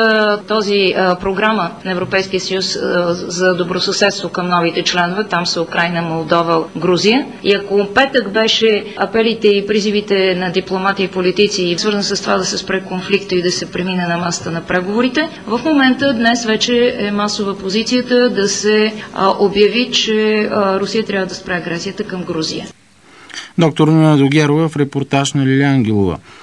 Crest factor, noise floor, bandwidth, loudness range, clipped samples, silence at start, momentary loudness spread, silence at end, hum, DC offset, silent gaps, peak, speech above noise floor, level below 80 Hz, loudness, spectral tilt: 14 dB; -41 dBFS; 10.5 kHz; 3 LU; under 0.1%; 0 s; 7 LU; 0 s; none; 0.2%; none; 0 dBFS; 27 dB; -50 dBFS; -15 LUFS; -4.5 dB/octave